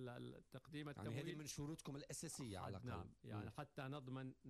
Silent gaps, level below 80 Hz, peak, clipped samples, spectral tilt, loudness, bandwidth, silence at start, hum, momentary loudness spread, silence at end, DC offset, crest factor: none; -72 dBFS; -38 dBFS; under 0.1%; -5 dB/octave; -52 LUFS; 13.5 kHz; 0 s; none; 5 LU; 0 s; under 0.1%; 14 dB